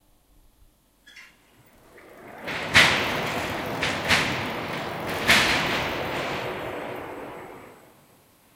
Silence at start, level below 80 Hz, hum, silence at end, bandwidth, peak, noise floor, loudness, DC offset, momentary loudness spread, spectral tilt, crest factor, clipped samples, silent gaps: 1.05 s; -52 dBFS; none; 0.8 s; 17 kHz; 0 dBFS; -59 dBFS; -23 LUFS; under 0.1%; 20 LU; -2.5 dB/octave; 26 dB; under 0.1%; none